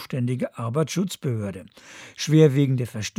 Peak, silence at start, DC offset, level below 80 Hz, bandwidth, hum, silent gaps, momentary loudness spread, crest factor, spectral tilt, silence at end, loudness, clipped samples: -4 dBFS; 0 s; under 0.1%; -66 dBFS; 15 kHz; none; none; 23 LU; 20 dB; -6.5 dB/octave; 0.1 s; -23 LUFS; under 0.1%